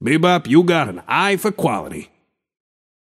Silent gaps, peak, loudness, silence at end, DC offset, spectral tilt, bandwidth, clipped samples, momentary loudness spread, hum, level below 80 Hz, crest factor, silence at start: none; -2 dBFS; -17 LUFS; 1.05 s; under 0.1%; -5.5 dB/octave; 15.5 kHz; under 0.1%; 13 LU; none; -58 dBFS; 16 dB; 0 s